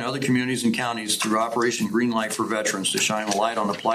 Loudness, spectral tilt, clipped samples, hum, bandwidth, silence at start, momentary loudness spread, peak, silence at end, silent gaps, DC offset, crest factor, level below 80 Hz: -23 LUFS; -3.5 dB/octave; under 0.1%; none; 15.5 kHz; 0 s; 3 LU; -8 dBFS; 0 s; none; under 0.1%; 16 dB; -66 dBFS